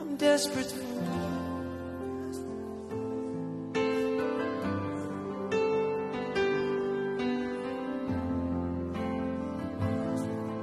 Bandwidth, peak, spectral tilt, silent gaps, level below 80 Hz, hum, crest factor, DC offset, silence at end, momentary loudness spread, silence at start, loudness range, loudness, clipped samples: 13 kHz; -14 dBFS; -5.5 dB/octave; none; -56 dBFS; none; 18 dB; under 0.1%; 0 s; 8 LU; 0 s; 3 LU; -32 LUFS; under 0.1%